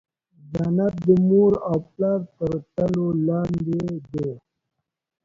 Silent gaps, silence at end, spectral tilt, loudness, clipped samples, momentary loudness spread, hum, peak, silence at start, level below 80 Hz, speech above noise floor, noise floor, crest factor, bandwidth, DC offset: none; 0.85 s; -10.5 dB/octave; -22 LUFS; under 0.1%; 12 LU; none; -6 dBFS; 0.45 s; -52 dBFS; 60 dB; -81 dBFS; 18 dB; 7.2 kHz; under 0.1%